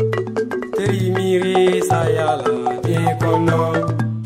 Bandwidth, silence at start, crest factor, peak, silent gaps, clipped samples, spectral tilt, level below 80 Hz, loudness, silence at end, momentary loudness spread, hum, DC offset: 15 kHz; 0 s; 14 dB; -4 dBFS; none; under 0.1%; -6.5 dB/octave; -50 dBFS; -18 LUFS; 0 s; 6 LU; none; under 0.1%